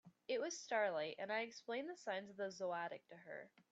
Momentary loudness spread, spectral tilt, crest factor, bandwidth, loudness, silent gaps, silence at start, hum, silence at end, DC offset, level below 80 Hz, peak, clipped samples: 14 LU; -3 dB/octave; 18 dB; 8.4 kHz; -44 LUFS; none; 0.05 s; none; 0.25 s; under 0.1%; under -90 dBFS; -26 dBFS; under 0.1%